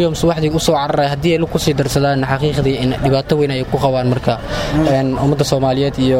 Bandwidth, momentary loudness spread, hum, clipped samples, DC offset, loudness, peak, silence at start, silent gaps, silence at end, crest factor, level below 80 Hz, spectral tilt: 16.5 kHz; 2 LU; none; under 0.1%; under 0.1%; -16 LUFS; 0 dBFS; 0 s; none; 0 s; 14 dB; -32 dBFS; -6 dB/octave